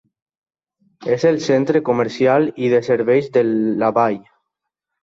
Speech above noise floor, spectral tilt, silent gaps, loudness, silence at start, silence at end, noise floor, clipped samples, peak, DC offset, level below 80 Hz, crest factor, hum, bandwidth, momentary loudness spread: 64 dB; -6.5 dB/octave; none; -17 LUFS; 1 s; 0.85 s; -80 dBFS; under 0.1%; -2 dBFS; under 0.1%; -62 dBFS; 16 dB; none; 7.6 kHz; 4 LU